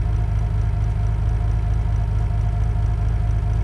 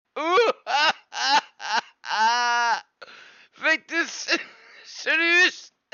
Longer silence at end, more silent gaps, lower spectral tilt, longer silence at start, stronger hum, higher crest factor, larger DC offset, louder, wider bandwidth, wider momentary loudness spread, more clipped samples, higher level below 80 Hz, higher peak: second, 0 s vs 0.3 s; neither; first, -8.5 dB/octave vs 0 dB/octave; second, 0 s vs 0.15 s; neither; second, 10 dB vs 16 dB; neither; about the same, -22 LUFS vs -22 LUFS; second, 6.2 kHz vs 7.4 kHz; second, 0 LU vs 11 LU; neither; first, -22 dBFS vs -84 dBFS; about the same, -10 dBFS vs -8 dBFS